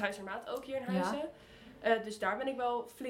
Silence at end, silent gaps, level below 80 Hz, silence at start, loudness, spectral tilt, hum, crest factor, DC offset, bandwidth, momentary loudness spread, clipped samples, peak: 0 s; none; -68 dBFS; 0 s; -36 LUFS; -5 dB/octave; none; 20 dB; under 0.1%; 16.5 kHz; 10 LU; under 0.1%; -16 dBFS